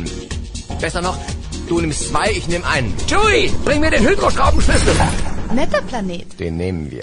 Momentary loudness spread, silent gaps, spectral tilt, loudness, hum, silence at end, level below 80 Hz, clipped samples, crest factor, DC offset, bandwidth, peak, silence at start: 12 LU; none; -4.5 dB/octave; -18 LUFS; none; 0 s; -24 dBFS; under 0.1%; 14 dB; under 0.1%; 11 kHz; -2 dBFS; 0 s